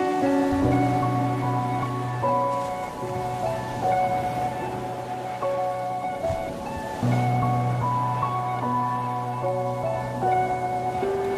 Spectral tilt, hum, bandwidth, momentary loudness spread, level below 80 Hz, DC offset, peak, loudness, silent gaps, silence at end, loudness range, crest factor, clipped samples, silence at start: -7.5 dB/octave; none; 14 kHz; 8 LU; -48 dBFS; under 0.1%; -10 dBFS; -26 LUFS; none; 0 s; 2 LU; 16 dB; under 0.1%; 0 s